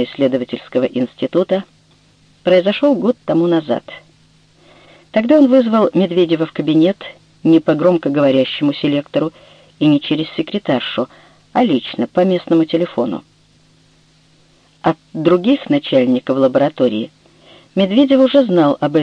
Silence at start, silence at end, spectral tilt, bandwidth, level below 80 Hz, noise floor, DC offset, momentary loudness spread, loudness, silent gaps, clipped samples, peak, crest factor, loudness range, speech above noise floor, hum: 0 s; 0 s; -8 dB/octave; 7.2 kHz; -58 dBFS; -52 dBFS; under 0.1%; 9 LU; -15 LUFS; none; under 0.1%; 0 dBFS; 16 dB; 4 LU; 38 dB; none